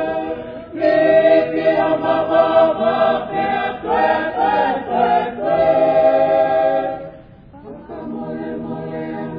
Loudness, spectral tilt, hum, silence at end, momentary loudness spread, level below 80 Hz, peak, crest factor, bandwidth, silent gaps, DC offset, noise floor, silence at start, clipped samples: -17 LUFS; -8.5 dB/octave; none; 0 s; 15 LU; -50 dBFS; -2 dBFS; 16 dB; 5.2 kHz; none; under 0.1%; -40 dBFS; 0 s; under 0.1%